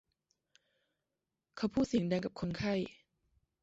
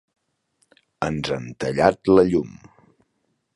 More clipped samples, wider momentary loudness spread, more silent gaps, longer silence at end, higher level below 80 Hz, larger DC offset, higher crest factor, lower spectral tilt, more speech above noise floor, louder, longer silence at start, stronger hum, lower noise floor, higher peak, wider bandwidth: neither; second, 9 LU vs 12 LU; neither; second, 0.7 s vs 1.05 s; second, -64 dBFS vs -50 dBFS; neither; about the same, 18 dB vs 22 dB; about the same, -6 dB/octave vs -6.5 dB/octave; about the same, 55 dB vs 52 dB; second, -36 LUFS vs -21 LUFS; first, 1.55 s vs 1 s; neither; first, -89 dBFS vs -72 dBFS; second, -20 dBFS vs -2 dBFS; second, 8 kHz vs 11.5 kHz